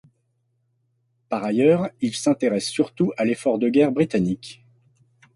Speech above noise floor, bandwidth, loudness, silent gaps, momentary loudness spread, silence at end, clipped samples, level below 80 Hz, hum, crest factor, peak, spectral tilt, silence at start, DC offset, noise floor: 49 dB; 11.5 kHz; -22 LUFS; none; 9 LU; 0.85 s; under 0.1%; -60 dBFS; none; 18 dB; -6 dBFS; -6 dB/octave; 1.3 s; under 0.1%; -70 dBFS